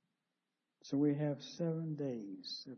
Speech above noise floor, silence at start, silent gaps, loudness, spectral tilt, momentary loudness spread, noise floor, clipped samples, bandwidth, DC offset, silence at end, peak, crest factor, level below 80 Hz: 51 dB; 0.85 s; none; -39 LUFS; -7 dB/octave; 11 LU; -89 dBFS; under 0.1%; 6.4 kHz; under 0.1%; 0 s; -24 dBFS; 16 dB; -88 dBFS